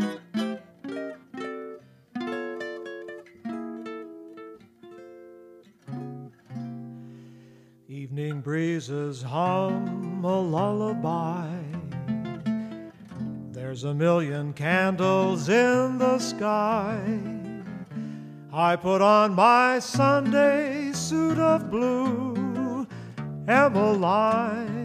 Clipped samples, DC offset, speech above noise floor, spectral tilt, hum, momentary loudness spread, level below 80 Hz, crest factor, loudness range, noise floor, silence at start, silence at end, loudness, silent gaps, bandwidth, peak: under 0.1%; under 0.1%; 30 dB; -6 dB/octave; none; 19 LU; -66 dBFS; 20 dB; 18 LU; -53 dBFS; 0 s; 0 s; -25 LUFS; none; 15 kHz; -6 dBFS